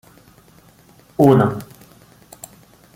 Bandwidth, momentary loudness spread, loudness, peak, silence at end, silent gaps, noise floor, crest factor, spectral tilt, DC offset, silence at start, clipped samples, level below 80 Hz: 17 kHz; 26 LU; -15 LUFS; -2 dBFS; 1.3 s; none; -50 dBFS; 20 dB; -8 dB/octave; under 0.1%; 1.2 s; under 0.1%; -52 dBFS